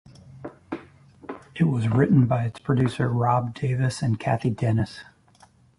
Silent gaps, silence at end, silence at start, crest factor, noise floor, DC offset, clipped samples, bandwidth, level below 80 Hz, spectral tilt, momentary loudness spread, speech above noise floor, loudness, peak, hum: none; 0.75 s; 0.3 s; 18 dB; -56 dBFS; under 0.1%; under 0.1%; 11.5 kHz; -50 dBFS; -8 dB/octave; 21 LU; 34 dB; -23 LUFS; -6 dBFS; none